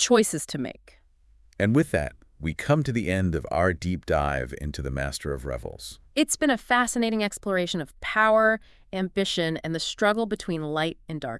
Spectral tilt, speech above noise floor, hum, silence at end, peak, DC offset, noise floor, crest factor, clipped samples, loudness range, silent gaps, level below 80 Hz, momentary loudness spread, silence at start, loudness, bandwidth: -4.5 dB/octave; 32 dB; none; 0 s; -8 dBFS; under 0.1%; -58 dBFS; 18 dB; under 0.1%; 3 LU; none; -44 dBFS; 12 LU; 0 s; -26 LUFS; 12 kHz